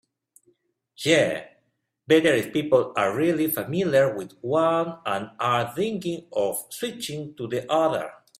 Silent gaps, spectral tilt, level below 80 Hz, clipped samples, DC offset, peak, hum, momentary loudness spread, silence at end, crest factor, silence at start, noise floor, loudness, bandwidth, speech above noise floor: none; -5 dB/octave; -66 dBFS; under 0.1%; under 0.1%; -6 dBFS; none; 10 LU; 0.25 s; 20 dB; 1 s; -72 dBFS; -24 LUFS; 16 kHz; 48 dB